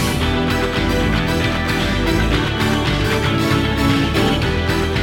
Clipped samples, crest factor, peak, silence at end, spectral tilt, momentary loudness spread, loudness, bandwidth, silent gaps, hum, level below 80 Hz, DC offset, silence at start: under 0.1%; 14 dB; -4 dBFS; 0 s; -5.5 dB/octave; 2 LU; -17 LUFS; 17.5 kHz; none; none; -26 dBFS; under 0.1%; 0 s